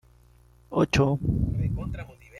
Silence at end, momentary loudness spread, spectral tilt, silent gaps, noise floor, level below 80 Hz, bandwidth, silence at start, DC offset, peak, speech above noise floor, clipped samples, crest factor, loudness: 0 s; 12 LU; -7 dB/octave; none; -56 dBFS; -38 dBFS; 12 kHz; 0.7 s; under 0.1%; -10 dBFS; 31 dB; under 0.1%; 18 dB; -26 LUFS